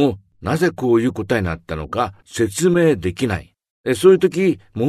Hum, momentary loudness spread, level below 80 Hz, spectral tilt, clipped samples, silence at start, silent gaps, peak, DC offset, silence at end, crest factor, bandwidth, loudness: none; 11 LU; -44 dBFS; -6 dB/octave; under 0.1%; 0 s; 3.70-3.84 s; 0 dBFS; under 0.1%; 0 s; 18 dB; 13.5 kHz; -18 LUFS